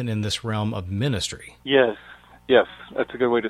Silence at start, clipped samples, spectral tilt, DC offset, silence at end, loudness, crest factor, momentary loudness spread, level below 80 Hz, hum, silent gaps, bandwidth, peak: 0 s; under 0.1%; -5 dB/octave; under 0.1%; 0 s; -23 LUFS; 20 dB; 11 LU; -52 dBFS; none; none; 14 kHz; -4 dBFS